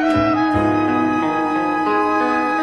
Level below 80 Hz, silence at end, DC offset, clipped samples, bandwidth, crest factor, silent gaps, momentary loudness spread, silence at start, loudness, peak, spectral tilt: -44 dBFS; 0 s; 0.2%; under 0.1%; 10 kHz; 12 dB; none; 2 LU; 0 s; -17 LUFS; -6 dBFS; -6.5 dB/octave